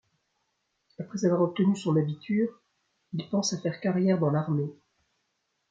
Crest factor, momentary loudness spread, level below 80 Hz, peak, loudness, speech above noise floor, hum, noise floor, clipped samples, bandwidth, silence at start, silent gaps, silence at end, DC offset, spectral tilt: 16 dB; 13 LU; -74 dBFS; -12 dBFS; -28 LUFS; 51 dB; none; -78 dBFS; under 0.1%; 7.8 kHz; 1 s; none; 1 s; under 0.1%; -6.5 dB/octave